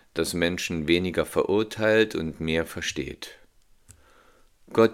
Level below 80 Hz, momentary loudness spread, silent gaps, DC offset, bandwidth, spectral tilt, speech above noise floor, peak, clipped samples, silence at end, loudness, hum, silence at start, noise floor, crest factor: -52 dBFS; 10 LU; none; under 0.1%; 16.5 kHz; -4.5 dB/octave; 32 dB; -6 dBFS; under 0.1%; 0 s; -25 LUFS; none; 0.15 s; -57 dBFS; 20 dB